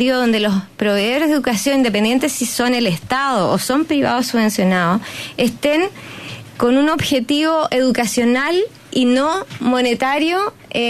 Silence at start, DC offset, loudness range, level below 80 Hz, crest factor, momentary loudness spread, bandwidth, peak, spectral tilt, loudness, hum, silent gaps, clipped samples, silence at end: 0 s; under 0.1%; 1 LU; -52 dBFS; 12 dB; 5 LU; 14 kHz; -4 dBFS; -4 dB/octave; -17 LUFS; none; none; under 0.1%; 0 s